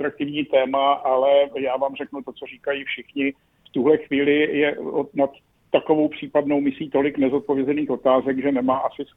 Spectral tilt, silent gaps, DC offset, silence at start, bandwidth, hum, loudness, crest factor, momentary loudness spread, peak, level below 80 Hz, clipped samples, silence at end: -8.5 dB/octave; none; under 0.1%; 0 s; 3.9 kHz; none; -21 LUFS; 18 dB; 8 LU; -4 dBFS; -62 dBFS; under 0.1%; 0.1 s